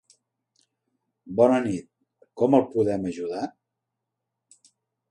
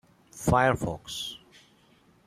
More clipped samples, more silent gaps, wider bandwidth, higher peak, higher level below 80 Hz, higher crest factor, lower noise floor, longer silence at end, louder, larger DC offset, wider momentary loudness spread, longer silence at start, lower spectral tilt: neither; neither; second, 11 kHz vs 15 kHz; about the same, -6 dBFS vs -8 dBFS; second, -64 dBFS vs -50 dBFS; about the same, 22 dB vs 22 dB; first, -83 dBFS vs -61 dBFS; first, 1.6 s vs 0.9 s; first, -24 LUFS vs -27 LUFS; neither; about the same, 13 LU vs 14 LU; first, 1.25 s vs 0.35 s; first, -7.5 dB/octave vs -5 dB/octave